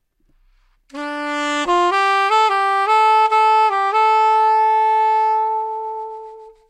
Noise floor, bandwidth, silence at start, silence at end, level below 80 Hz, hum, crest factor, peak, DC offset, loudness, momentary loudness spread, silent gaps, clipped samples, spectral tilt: -58 dBFS; 11 kHz; 0.95 s; 0.2 s; -58 dBFS; none; 12 dB; -4 dBFS; under 0.1%; -16 LUFS; 14 LU; none; under 0.1%; -1 dB/octave